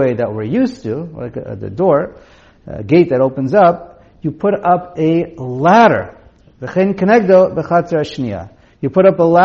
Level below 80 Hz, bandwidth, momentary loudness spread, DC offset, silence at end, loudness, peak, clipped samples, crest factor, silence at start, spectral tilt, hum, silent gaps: -48 dBFS; 7.4 kHz; 16 LU; under 0.1%; 0 s; -14 LUFS; 0 dBFS; under 0.1%; 14 dB; 0 s; -6.5 dB/octave; none; none